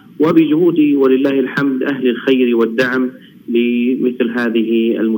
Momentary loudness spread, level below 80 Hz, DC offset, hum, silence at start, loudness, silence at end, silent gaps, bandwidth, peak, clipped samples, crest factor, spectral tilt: 5 LU; -68 dBFS; under 0.1%; none; 0.2 s; -14 LUFS; 0 s; none; 17 kHz; 0 dBFS; under 0.1%; 14 dB; -7.5 dB/octave